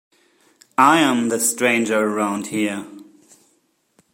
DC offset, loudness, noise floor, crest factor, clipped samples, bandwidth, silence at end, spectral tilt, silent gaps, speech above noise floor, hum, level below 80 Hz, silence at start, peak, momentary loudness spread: under 0.1%; -18 LUFS; -64 dBFS; 20 dB; under 0.1%; 16.5 kHz; 1.1 s; -3 dB/octave; none; 46 dB; none; -68 dBFS; 0.8 s; -2 dBFS; 12 LU